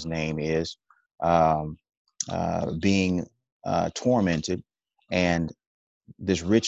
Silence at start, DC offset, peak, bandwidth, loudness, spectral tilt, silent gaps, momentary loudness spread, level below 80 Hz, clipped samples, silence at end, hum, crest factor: 0 s; under 0.1%; -8 dBFS; 8.2 kHz; -26 LUFS; -5.5 dB/octave; 1.97-2.05 s, 3.52-3.60 s, 5.67-6.01 s; 13 LU; -46 dBFS; under 0.1%; 0 s; none; 18 dB